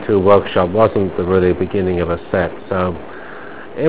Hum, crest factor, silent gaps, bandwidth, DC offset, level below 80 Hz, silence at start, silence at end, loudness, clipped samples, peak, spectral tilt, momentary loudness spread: none; 16 dB; none; 4 kHz; 2%; -36 dBFS; 0 s; 0 s; -16 LUFS; under 0.1%; 0 dBFS; -11.5 dB/octave; 19 LU